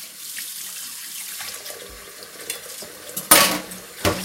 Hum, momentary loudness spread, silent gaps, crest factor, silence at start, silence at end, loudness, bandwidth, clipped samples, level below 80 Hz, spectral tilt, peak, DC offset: none; 22 LU; none; 24 dB; 0 s; 0 s; -21 LUFS; 17 kHz; under 0.1%; -52 dBFS; -1 dB/octave; 0 dBFS; under 0.1%